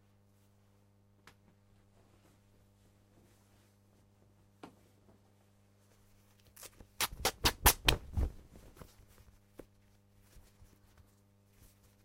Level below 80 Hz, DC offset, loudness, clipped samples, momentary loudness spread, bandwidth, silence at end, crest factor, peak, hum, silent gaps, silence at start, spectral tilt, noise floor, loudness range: -48 dBFS; under 0.1%; -32 LUFS; under 0.1%; 31 LU; 16 kHz; 3.2 s; 32 dB; -10 dBFS; 50 Hz at -70 dBFS; none; 4.65 s; -2 dB/octave; -68 dBFS; 11 LU